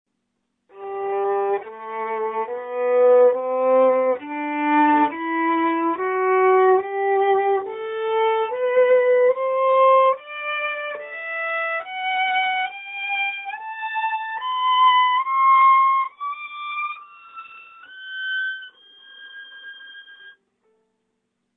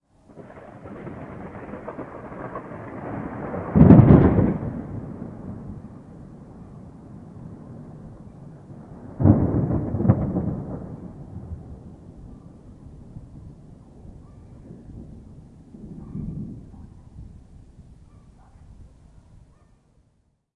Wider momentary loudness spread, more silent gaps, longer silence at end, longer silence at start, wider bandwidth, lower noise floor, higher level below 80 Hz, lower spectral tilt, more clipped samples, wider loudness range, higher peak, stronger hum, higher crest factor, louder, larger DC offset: second, 18 LU vs 26 LU; neither; second, 1.25 s vs 1.7 s; first, 0.75 s vs 0.35 s; about the same, 4 kHz vs 3.7 kHz; first, -75 dBFS vs -66 dBFS; second, -74 dBFS vs -40 dBFS; second, -6.5 dB/octave vs -12 dB/octave; neither; second, 12 LU vs 25 LU; second, -6 dBFS vs 0 dBFS; neither; second, 14 dB vs 24 dB; about the same, -20 LUFS vs -20 LUFS; neither